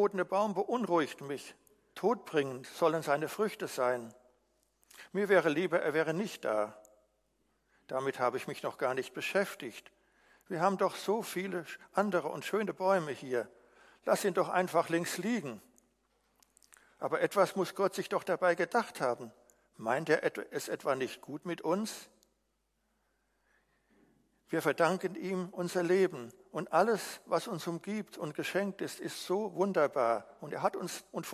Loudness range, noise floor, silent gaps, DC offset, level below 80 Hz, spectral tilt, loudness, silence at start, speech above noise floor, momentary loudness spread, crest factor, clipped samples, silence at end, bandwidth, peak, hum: 4 LU; -79 dBFS; none; under 0.1%; -80 dBFS; -5 dB/octave; -33 LUFS; 0 s; 46 dB; 11 LU; 22 dB; under 0.1%; 0 s; 16 kHz; -12 dBFS; none